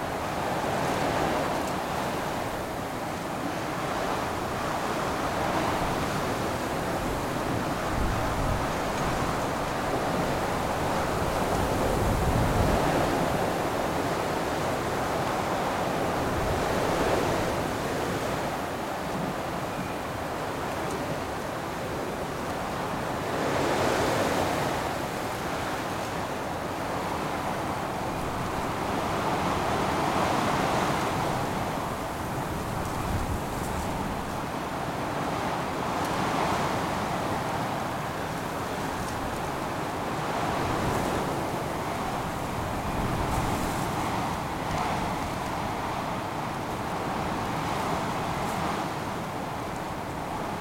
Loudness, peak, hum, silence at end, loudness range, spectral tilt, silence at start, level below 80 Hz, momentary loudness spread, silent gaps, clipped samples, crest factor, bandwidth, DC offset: -29 LUFS; -12 dBFS; none; 0 s; 4 LU; -5 dB/octave; 0 s; -42 dBFS; 6 LU; none; under 0.1%; 18 dB; 16.5 kHz; under 0.1%